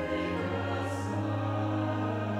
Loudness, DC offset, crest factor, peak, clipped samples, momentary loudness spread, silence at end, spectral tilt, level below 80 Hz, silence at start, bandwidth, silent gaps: -32 LUFS; under 0.1%; 12 dB; -20 dBFS; under 0.1%; 2 LU; 0 s; -7 dB/octave; -58 dBFS; 0 s; 11.5 kHz; none